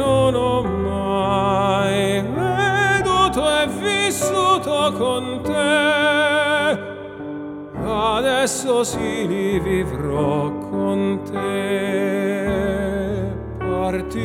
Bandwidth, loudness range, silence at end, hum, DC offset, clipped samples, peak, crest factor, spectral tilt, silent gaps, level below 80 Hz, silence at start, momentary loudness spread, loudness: 17 kHz; 4 LU; 0 s; none; under 0.1%; under 0.1%; -4 dBFS; 16 dB; -4.5 dB/octave; none; -40 dBFS; 0 s; 8 LU; -19 LUFS